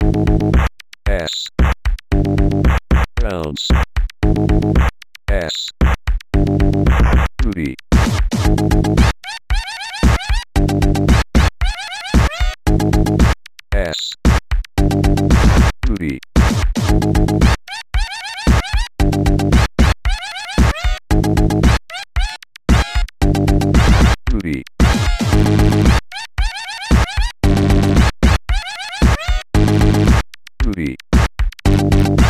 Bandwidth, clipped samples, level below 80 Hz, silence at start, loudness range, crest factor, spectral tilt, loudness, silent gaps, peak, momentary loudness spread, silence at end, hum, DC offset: 15 kHz; under 0.1%; -18 dBFS; 0 s; 2 LU; 14 dB; -6 dB/octave; -16 LUFS; none; 0 dBFS; 9 LU; 0 s; none; under 0.1%